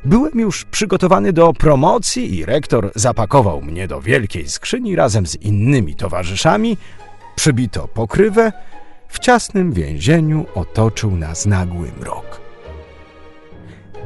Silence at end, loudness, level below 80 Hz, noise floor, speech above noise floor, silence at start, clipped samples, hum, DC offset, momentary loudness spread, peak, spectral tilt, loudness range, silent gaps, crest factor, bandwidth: 0 s; -16 LUFS; -32 dBFS; -39 dBFS; 24 dB; 0 s; under 0.1%; none; under 0.1%; 12 LU; 0 dBFS; -5.5 dB/octave; 4 LU; none; 16 dB; 11.5 kHz